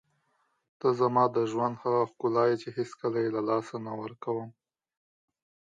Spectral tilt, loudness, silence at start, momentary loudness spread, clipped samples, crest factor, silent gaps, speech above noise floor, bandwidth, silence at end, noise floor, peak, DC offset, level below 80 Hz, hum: -7.5 dB/octave; -29 LUFS; 0.85 s; 11 LU; under 0.1%; 20 dB; none; 46 dB; 7.8 kHz; 1.25 s; -74 dBFS; -10 dBFS; under 0.1%; -78 dBFS; none